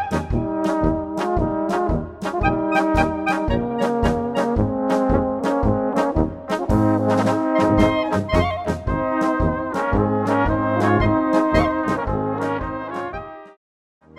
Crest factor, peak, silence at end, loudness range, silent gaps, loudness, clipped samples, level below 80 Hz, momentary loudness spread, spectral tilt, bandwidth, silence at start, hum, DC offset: 18 dB; -2 dBFS; 0.65 s; 2 LU; none; -20 LUFS; under 0.1%; -32 dBFS; 6 LU; -7.5 dB/octave; 13 kHz; 0 s; none; under 0.1%